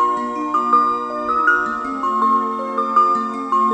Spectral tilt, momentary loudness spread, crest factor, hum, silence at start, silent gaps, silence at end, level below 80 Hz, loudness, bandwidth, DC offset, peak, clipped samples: -4.5 dB/octave; 7 LU; 14 dB; none; 0 s; none; 0 s; -56 dBFS; -18 LUFS; 9.4 kHz; under 0.1%; -4 dBFS; under 0.1%